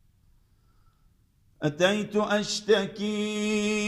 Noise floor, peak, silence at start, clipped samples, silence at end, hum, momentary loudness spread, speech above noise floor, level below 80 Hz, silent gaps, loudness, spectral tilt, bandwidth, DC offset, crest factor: -63 dBFS; -8 dBFS; 1.6 s; under 0.1%; 0 s; none; 6 LU; 37 dB; -62 dBFS; none; -26 LUFS; -4 dB/octave; 12.5 kHz; under 0.1%; 20 dB